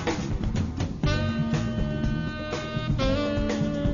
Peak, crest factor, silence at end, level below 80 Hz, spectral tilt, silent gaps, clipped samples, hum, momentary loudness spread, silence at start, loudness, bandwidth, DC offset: -12 dBFS; 14 dB; 0 s; -34 dBFS; -6.5 dB/octave; none; under 0.1%; none; 5 LU; 0 s; -28 LUFS; 7.4 kHz; under 0.1%